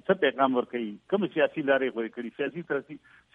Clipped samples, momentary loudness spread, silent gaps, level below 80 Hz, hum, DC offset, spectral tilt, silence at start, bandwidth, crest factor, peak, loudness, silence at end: under 0.1%; 11 LU; none; -76 dBFS; none; under 0.1%; -8 dB/octave; 0.1 s; 3.9 kHz; 18 dB; -10 dBFS; -28 LUFS; 0.35 s